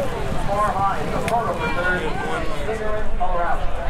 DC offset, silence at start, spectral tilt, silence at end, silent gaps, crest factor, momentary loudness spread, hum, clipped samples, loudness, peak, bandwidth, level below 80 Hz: under 0.1%; 0 s; -5.5 dB/octave; 0 s; none; 12 dB; 5 LU; none; under 0.1%; -23 LUFS; -8 dBFS; 12.5 kHz; -26 dBFS